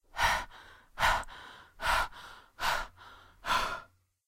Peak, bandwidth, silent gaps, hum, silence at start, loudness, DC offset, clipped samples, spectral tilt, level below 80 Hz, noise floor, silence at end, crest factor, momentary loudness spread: -14 dBFS; 16 kHz; none; none; 0.15 s; -32 LUFS; under 0.1%; under 0.1%; -1.5 dB/octave; -46 dBFS; -55 dBFS; 0.45 s; 20 dB; 21 LU